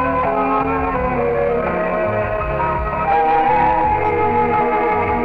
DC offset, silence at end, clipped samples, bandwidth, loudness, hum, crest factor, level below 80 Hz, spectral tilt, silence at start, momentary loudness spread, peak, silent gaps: under 0.1%; 0 s; under 0.1%; 5.2 kHz; -17 LUFS; none; 12 dB; -32 dBFS; -9 dB/octave; 0 s; 5 LU; -6 dBFS; none